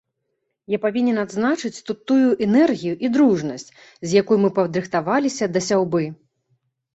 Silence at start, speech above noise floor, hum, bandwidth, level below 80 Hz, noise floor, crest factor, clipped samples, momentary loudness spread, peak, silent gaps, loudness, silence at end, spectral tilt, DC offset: 0.7 s; 56 dB; none; 8.2 kHz; -62 dBFS; -75 dBFS; 16 dB; under 0.1%; 11 LU; -4 dBFS; none; -20 LUFS; 0.8 s; -6 dB/octave; under 0.1%